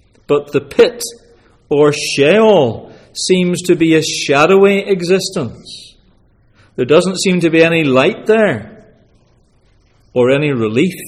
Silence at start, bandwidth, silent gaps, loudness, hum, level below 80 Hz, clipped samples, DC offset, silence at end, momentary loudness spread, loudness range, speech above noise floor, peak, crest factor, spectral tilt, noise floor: 0.3 s; 15 kHz; none; -12 LUFS; none; -52 dBFS; under 0.1%; under 0.1%; 0 s; 15 LU; 3 LU; 40 dB; 0 dBFS; 14 dB; -5 dB/octave; -52 dBFS